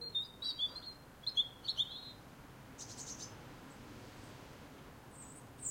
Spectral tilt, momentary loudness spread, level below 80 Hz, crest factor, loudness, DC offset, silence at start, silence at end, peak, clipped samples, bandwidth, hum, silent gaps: -1.5 dB/octave; 19 LU; -66 dBFS; 22 dB; -39 LUFS; under 0.1%; 0 s; 0 s; -24 dBFS; under 0.1%; 16.5 kHz; none; none